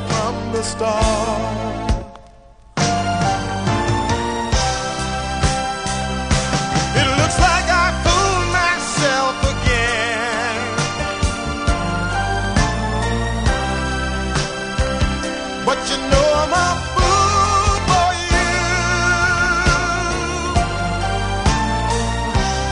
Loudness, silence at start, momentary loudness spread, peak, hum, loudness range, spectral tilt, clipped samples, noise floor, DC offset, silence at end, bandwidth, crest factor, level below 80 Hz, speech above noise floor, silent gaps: -18 LUFS; 0 s; 7 LU; -2 dBFS; none; 5 LU; -4 dB/octave; under 0.1%; -44 dBFS; under 0.1%; 0 s; 10.5 kHz; 18 dB; -26 dBFS; 25 dB; none